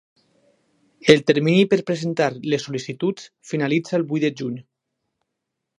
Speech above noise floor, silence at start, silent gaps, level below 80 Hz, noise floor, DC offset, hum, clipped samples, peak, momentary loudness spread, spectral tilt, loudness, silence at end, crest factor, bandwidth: 60 dB; 1.05 s; none; -66 dBFS; -80 dBFS; under 0.1%; none; under 0.1%; 0 dBFS; 14 LU; -6 dB/octave; -21 LUFS; 1.15 s; 22 dB; 11 kHz